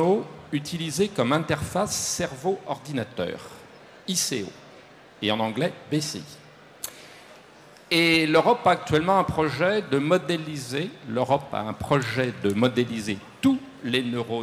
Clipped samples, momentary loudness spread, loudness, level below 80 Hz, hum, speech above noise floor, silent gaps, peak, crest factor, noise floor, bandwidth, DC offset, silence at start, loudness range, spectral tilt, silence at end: under 0.1%; 12 LU; -25 LUFS; -56 dBFS; none; 25 dB; none; -8 dBFS; 18 dB; -50 dBFS; 16 kHz; under 0.1%; 0 s; 7 LU; -4.5 dB/octave; 0 s